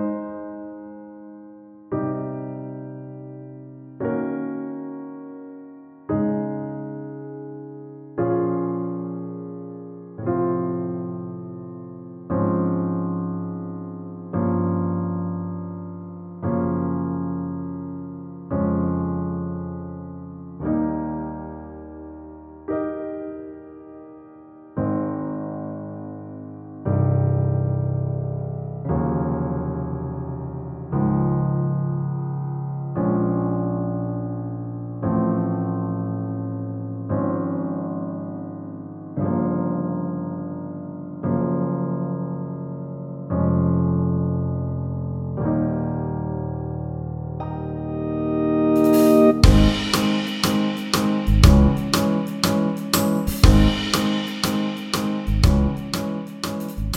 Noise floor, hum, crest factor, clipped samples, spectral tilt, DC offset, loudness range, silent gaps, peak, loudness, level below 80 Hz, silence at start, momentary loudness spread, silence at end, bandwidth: -44 dBFS; none; 22 dB; under 0.1%; -6.5 dB/octave; under 0.1%; 12 LU; none; 0 dBFS; -23 LUFS; -32 dBFS; 0 s; 17 LU; 0 s; 16 kHz